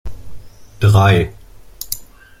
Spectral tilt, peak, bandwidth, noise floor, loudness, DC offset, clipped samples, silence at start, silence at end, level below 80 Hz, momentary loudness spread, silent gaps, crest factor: -6 dB/octave; -2 dBFS; 16.5 kHz; -35 dBFS; -15 LUFS; under 0.1%; under 0.1%; 0.05 s; 0.35 s; -36 dBFS; 20 LU; none; 16 dB